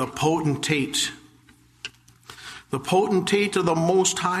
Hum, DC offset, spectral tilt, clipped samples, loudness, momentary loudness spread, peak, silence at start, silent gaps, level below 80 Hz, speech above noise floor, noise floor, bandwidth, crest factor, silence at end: none; under 0.1%; -4 dB/octave; under 0.1%; -22 LUFS; 18 LU; -6 dBFS; 0 s; none; -58 dBFS; 33 dB; -55 dBFS; 13.5 kHz; 18 dB; 0 s